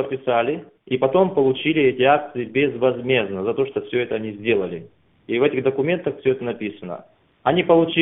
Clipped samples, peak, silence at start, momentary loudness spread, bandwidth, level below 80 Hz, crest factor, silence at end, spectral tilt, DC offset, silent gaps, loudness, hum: under 0.1%; -2 dBFS; 0 s; 12 LU; 3.9 kHz; -60 dBFS; 18 dB; 0 s; -11 dB/octave; under 0.1%; none; -21 LUFS; none